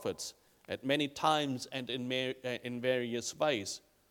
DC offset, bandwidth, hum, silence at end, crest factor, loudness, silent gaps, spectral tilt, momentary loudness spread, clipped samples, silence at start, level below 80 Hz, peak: under 0.1%; 19 kHz; none; 0.3 s; 22 dB; -35 LUFS; none; -3.5 dB/octave; 12 LU; under 0.1%; 0 s; -76 dBFS; -14 dBFS